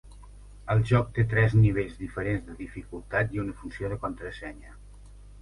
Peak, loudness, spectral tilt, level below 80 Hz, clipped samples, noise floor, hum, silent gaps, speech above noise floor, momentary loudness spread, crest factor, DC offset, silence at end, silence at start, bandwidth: -10 dBFS; -27 LUFS; -8.5 dB/octave; -44 dBFS; under 0.1%; -48 dBFS; 50 Hz at -45 dBFS; none; 21 dB; 18 LU; 18 dB; under 0.1%; 0 s; 0.05 s; 11 kHz